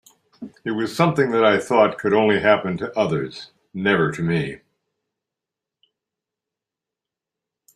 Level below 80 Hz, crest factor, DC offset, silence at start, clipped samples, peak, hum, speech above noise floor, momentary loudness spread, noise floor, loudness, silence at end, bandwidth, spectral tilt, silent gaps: -60 dBFS; 20 dB; under 0.1%; 0.4 s; under 0.1%; -2 dBFS; none; 67 dB; 15 LU; -87 dBFS; -20 LUFS; 3.2 s; 13.5 kHz; -6.5 dB/octave; none